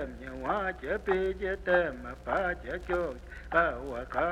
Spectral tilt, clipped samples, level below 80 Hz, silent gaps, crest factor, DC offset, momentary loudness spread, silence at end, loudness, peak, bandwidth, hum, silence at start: -6.5 dB/octave; under 0.1%; -46 dBFS; none; 20 dB; under 0.1%; 10 LU; 0 s; -31 LUFS; -12 dBFS; 11.5 kHz; none; 0 s